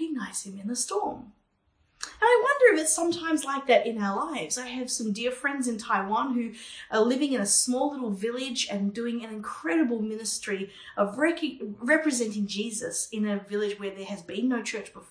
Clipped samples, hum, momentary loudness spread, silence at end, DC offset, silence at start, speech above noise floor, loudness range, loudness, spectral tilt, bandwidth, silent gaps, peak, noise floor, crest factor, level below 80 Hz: under 0.1%; none; 12 LU; 0.05 s; under 0.1%; 0 s; 42 dB; 5 LU; -27 LUFS; -3 dB/octave; 10.5 kHz; none; -6 dBFS; -70 dBFS; 20 dB; -68 dBFS